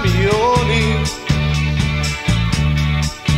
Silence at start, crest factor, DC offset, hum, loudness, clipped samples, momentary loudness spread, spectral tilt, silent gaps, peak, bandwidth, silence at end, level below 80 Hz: 0 s; 12 dB; under 0.1%; none; -17 LUFS; under 0.1%; 4 LU; -5.5 dB/octave; none; -4 dBFS; 14 kHz; 0 s; -24 dBFS